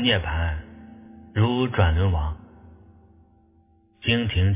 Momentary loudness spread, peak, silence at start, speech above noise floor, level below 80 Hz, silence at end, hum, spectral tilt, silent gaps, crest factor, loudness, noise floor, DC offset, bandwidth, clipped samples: 23 LU; -4 dBFS; 0 s; 38 dB; -32 dBFS; 0 s; none; -10.5 dB/octave; none; 20 dB; -24 LUFS; -59 dBFS; under 0.1%; 3.8 kHz; under 0.1%